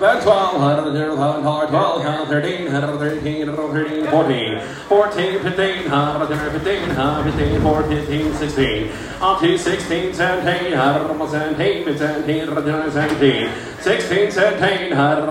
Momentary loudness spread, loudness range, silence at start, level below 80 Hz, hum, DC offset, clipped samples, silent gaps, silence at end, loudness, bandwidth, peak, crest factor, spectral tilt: 6 LU; 1 LU; 0 s; -38 dBFS; none; under 0.1%; under 0.1%; none; 0 s; -18 LUFS; 16 kHz; 0 dBFS; 16 dB; -6 dB/octave